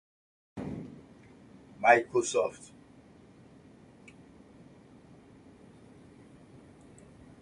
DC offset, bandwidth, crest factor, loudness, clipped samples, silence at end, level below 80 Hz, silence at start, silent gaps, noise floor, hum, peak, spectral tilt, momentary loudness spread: under 0.1%; 11.5 kHz; 28 dB; -28 LUFS; under 0.1%; 4.75 s; -66 dBFS; 0.55 s; none; -56 dBFS; none; -8 dBFS; -4 dB/octave; 31 LU